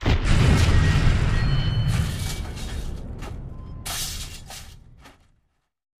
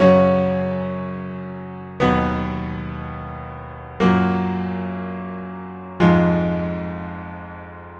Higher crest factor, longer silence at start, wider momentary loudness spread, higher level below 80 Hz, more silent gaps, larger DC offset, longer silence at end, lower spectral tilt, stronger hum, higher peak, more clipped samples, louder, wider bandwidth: about the same, 18 dB vs 18 dB; about the same, 0 s vs 0 s; about the same, 18 LU vs 17 LU; first, -26 dBFS vs -40 dBFS; neither; neither; first, 0.9 s vs 0 s; second, -5 dB/octave vs -8.5 dB/octave; neither; second, -6 dBFS vs -2 dBFS; neither; about the same, -23 LUFS vs -21 LUFS; first, 15.5 kHz vs 7 kHz